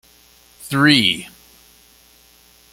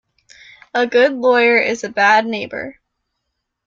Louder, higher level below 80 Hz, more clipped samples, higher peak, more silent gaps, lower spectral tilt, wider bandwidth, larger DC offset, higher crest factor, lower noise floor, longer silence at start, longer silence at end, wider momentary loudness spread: about the same, -15 LUFS vs -15 LUFS; first, -56 dBFS vs -64 dBFS; neither; about the same, 0 dBFS vs 0 dBFS; neither; about the same, -4 dB/octave vs -3.5 dB/octave; first, 16.5 kHz vs 7.6 kHz; neither; first, 22 dB vs 16 dB; second, -51 dBFS vs -75 dBFS; second, 0.6 s vs 0.75 s; first, 1.45 s vs 0.95 s; first, 26 LU vs 14 LU